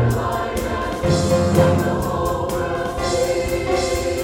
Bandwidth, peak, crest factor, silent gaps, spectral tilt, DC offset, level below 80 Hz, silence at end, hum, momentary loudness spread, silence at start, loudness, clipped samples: 17.5 kHz; -2 dBFS; 18 dB; none; -5.5 dB/octave; under 0.1%; -34 dBFS; 0 s; none; 7 LU; 0 s; -20 LUFS; under 0.1%